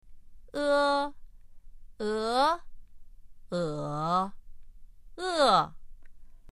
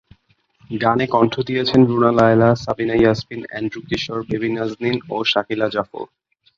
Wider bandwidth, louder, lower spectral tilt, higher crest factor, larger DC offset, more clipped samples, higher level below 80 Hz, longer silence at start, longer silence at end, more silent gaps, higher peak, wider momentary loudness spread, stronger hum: first, 12 kHz vs 7.4 kHz; second, -29 LUFS vs -18 LUFS; second, -4.5 dB/octave vs -7 dB/octave; first, 22 dB vs 16 dB; neither; neither; about the same, -50 dBFS vs -50 dBFS; second, 0.05 s vs 0.7 s; second, 0 s vs 0.55 s; neither; second, -10 dBFS vs -2 dBFS; about the same, 14 LU vs 13 LU; neither